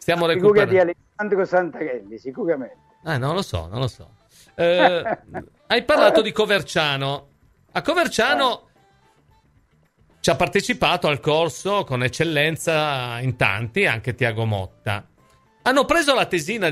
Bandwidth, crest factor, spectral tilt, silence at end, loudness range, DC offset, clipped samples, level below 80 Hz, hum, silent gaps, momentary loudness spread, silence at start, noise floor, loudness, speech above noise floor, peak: 15.5 kHz; 20 dB; -4.5 dB/octave; 0 s; 5 LU; under 0.1%; under 0.1%; -50 dBFS; none; none; 13 LU; 0 s; -60 dBFS; -20 LUFS; 39 dB; 0 dBFS